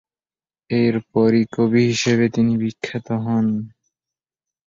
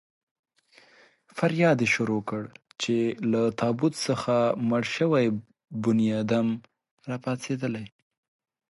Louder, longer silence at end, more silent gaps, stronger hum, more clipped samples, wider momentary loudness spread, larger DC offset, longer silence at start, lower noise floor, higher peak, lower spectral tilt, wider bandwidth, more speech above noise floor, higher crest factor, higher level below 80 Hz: first, -19 LUFS vs -26 LUFS; first, 1 s vs 0.85 s; second, none vs 6.91-6.97 s; neither; neither; second, 8 LU vs 13 LU; neither; second, 0.7 s vs 1.35 s; first, under -90 dBFS vs -58 dBFS; first, -6 dBFS vs -10 dBFS; about the same, -6 dB/octave vs -6 dB/octave; second, 7.8 kHz vs 11.5 kHz; first, over 72 dB vs 33 dB; about the same, 16 dB vs 18 dB; first, -56 dBFS vs -66 dBFS